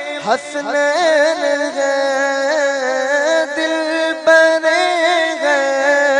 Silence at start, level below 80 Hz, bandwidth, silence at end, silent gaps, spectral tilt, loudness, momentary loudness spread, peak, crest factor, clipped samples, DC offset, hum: 0 s; -72 dBFS; 10.5 kHz; 0 s; none; -1.5 dB/octave; -15 LUFS; 6 LU; 0 dBFS; 14 dB; under 0.1%; under 0.1%; none